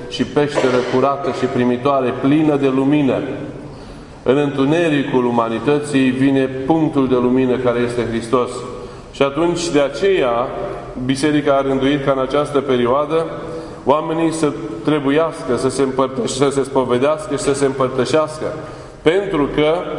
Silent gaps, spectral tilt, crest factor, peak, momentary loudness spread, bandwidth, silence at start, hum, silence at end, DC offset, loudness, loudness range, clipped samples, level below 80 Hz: none; -6 dB/octave; 16 dB; 0 dBFS; 10 LU; 11 kHz; 0 s; none; 0 s; under 0.1%; -17 LUFS; 2 LU; under 0.1%; -44 dBFS